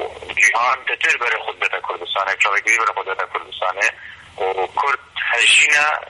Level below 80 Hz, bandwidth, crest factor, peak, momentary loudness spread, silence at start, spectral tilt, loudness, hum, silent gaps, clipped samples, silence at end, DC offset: -60 dBFS; 11.5 kHz; 16 dB; -4 dBFS; 13 LU; 0 s; 1 dB/octave; -17 LUFS; none; none; under 0.1%; 0 s; under 0.1%